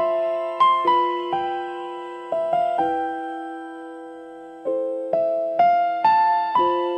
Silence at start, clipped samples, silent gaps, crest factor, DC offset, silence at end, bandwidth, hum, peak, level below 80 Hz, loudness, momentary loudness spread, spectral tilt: 0 s; under 0.1%; none; 14 dB; under 0.1%; 0 s; 8.6 kHz; none; -8 dBFS; -64 dBFS; -21 LUFS; 17 LU; -5.5 dB/octave